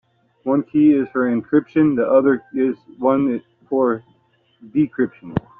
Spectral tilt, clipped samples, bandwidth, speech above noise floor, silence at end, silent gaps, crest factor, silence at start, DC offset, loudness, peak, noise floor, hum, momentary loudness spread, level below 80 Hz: -8 dB/octave; under 0.1%; 3.7 kHz; 42 dB; 0.2 s; none; 16 dB; 0.45 s; under 0.1%; -19 LUFS; -4 dBFS; -60 dBFS; none; 9 LU; -54 dBFS